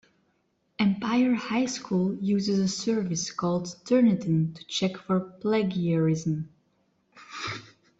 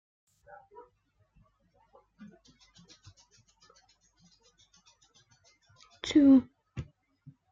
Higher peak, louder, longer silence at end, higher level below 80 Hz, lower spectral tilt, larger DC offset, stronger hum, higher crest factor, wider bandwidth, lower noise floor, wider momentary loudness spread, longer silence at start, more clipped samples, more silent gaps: about the same, -12 dBFS vs -12 dBFS; second, -27 LUFS vs -24 LUFS; second, 0.35 s vs 0.7 s; about the same, -66 dBFS vs -66 dBFS; about the same, -5.5 dB/octave vs -5.5 dB/octave; neither; neither; about the same, 16 dB vs 20 dB; about the same, 8 kHz vs 7.6 kHz; about the same, -71 dBFS vs -71 dBFS; second, 11 LU vs 31 LU; second, 0.8 s vs 6.05 s; neither; neither